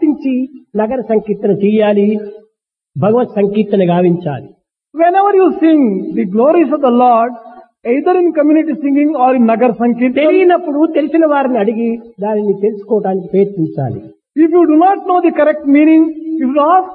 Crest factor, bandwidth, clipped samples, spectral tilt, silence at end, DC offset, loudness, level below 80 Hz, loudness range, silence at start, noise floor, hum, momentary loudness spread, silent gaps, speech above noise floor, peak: 12 dB; 4.2 kHz; under 0.1%; -11.5 dB/octave; 0 s; under 0.1%; -12 LUFS; -58 dBFS; 3 LU; 0 s; -58 dBFS; none; 10 LU; none; 47 dB; 0 dBFS